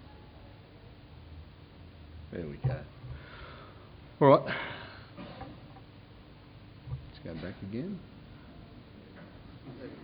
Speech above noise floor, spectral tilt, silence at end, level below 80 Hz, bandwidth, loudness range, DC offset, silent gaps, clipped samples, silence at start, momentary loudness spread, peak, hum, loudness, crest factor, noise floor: 24 dB; -10.5 dB/octave; 0 s; -56 dBFS; 5.2 kHz; 13 LU; under 0.1%; none; under 0.1%; 0 s; 20 LU; -8 dBFS; none; -32 LUFS; 28 dB; -53 dBFS